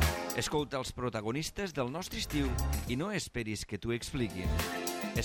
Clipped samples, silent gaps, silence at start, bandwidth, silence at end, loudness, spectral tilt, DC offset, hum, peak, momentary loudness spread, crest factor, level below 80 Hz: under 0.1%; none; 0 s; 17 kHz; 0 s; -35 LUFS; -4.5 dB/octave; under 0.1%; none; -16 dBFS; 4 LU; 18 dB; -42 dBFS